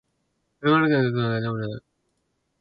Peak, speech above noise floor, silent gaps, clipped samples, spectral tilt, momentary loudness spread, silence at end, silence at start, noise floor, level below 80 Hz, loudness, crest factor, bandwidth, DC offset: -6 dBFS; 51 dB; none; under 0.1%; -10 dB/octave; 14 LU; 0.8 s; 0.6 s; -74 dBFS; -62 dBFS; -23 LUFS; 20 dB; 5.4 kHz; under 0.1%